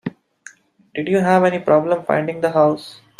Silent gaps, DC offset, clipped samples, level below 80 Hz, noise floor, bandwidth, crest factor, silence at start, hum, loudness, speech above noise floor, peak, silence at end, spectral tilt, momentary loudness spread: none; under 0.1%; under 0.1%; -62 dBFS; -45 dBFS; 13 kHz; 16 dB; 0.05 s; none; -17 LUFS; 29 dB; -2 dBFS; 0.25 s; -7 dB/octave; 13 LU